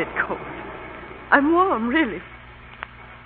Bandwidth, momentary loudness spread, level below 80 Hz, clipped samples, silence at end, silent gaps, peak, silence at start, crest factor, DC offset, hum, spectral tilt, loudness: 4.5 kHz; 21 LU; -48 dBFS; under 0.1%; 0 s; none; -2 dBFS; 0 s; 22 dB; under 0.1%; 60 Hz at -45 dBFS; -9.5 dB/octave; -20 LUFS